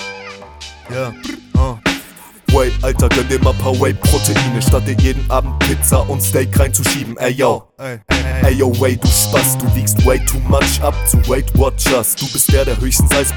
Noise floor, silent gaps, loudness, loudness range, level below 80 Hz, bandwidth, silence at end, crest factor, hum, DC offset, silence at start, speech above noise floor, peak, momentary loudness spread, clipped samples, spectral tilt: -37 dBFS; none; -14 LUFS; 3 LU; -20 dBFS; 19.5 kHz; 0 s; 14 dB; none; under 0.1%; 0 s; 23 dB; 0 dBFS; 11 LU; under 0.1%; -4.5 dB/octave